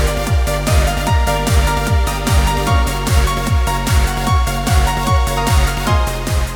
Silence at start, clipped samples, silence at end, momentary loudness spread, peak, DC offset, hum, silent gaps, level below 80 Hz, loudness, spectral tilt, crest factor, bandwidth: 0 s; under 0.1%; 0 s; 2 LU; -2 dBFS; under 0.1%; none; none; -18 dBFS; -16 LUFS; -5 dB/octave; 12 dB; over 20 kHz